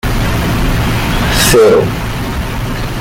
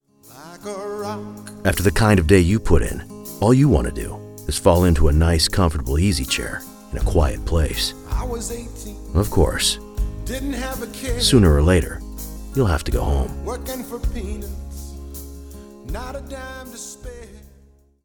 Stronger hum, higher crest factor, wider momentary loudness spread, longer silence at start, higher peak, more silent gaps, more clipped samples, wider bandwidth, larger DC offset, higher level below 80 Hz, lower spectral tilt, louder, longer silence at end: neither; second, 12 dB vs 20 dB; second, 11 LU vs 19 LU; second, 0.05 s vs 0.3 s; about the same, 0 dBFS vs 0 dBFS; neither; neither; second, 17 kHz vs 19 kHz; neither; first, -20 dBFS vs -26 dBFS; about the same, -4.5 dB/octave vs -5.5 dB/octave; first, -12 LUFS vs -20 LUFS; second, 0 s vs 0.6 s